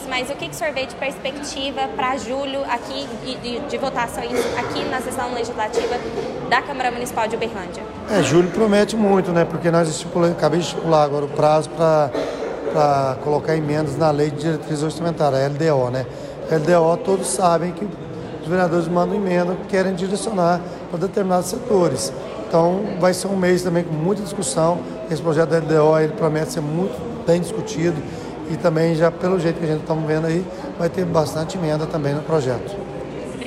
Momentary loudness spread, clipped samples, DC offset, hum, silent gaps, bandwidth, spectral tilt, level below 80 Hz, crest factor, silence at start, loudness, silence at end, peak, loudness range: 10 LU; under 0.1%; under 0.1%; none; none; 14.5 kHz; -5.5 dB/octave; -48 dBFS; 14 dB; 0 s; -20 LUFS; 0 s; -6 dBFS; 5 LU